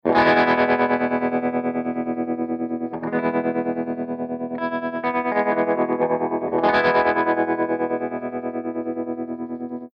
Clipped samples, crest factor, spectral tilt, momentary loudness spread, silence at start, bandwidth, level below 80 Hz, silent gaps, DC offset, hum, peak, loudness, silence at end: under 0.1%; 16 dB; -7.5 dB/octave; 11 LU; 0.05 s; 6 kHz; -60 dBFS; none; under 0.1%; none; -6 dBFS; -22 LUFS; 0.05 s